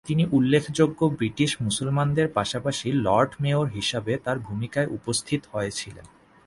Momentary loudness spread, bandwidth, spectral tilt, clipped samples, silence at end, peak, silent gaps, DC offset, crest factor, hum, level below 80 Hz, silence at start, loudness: 8 LU; 11.5 kHz; -5.5 dB/octave; under 0.1%; 0.4 s; -6 dBFS; none; under 0.1%; 18 dB; none; -54 dBFS; 0.05 s; -25 LUFS